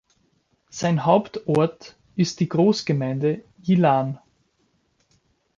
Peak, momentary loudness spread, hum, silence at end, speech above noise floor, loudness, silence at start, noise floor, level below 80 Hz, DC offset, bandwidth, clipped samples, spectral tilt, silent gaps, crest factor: -4 dBFS; 11 LU; none; 1.4 s; 46 dB; -22 LUFS; 0.75 s; -67 dBFS; -62 dBFS; under 0.1%; 7.6 kHz; under 0.1%; -6.5 dB/octave; none; 18 dB